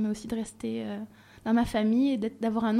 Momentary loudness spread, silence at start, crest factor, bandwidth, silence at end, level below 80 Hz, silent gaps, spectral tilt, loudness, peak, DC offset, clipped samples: 13 LU; 0 s; 14 dB; 13 kHz; 0 s; -54 dBFS; none; -6 dB/octave; -29 LUFS; -14 dBFS; under 0.1%; under 0.1%